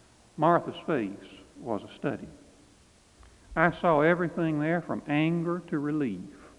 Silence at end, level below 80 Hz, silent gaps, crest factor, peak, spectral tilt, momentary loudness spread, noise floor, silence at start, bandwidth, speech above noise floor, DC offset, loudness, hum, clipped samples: 0.1 s; -58 dBFS; none; 22 dB; -6 dBFS; -8 dB/octave; 16 LU; -59 dBFS; 0.35 s; 11 kHz; 31 dB; under 0.1%; -28 LUFS; none; under 0.1%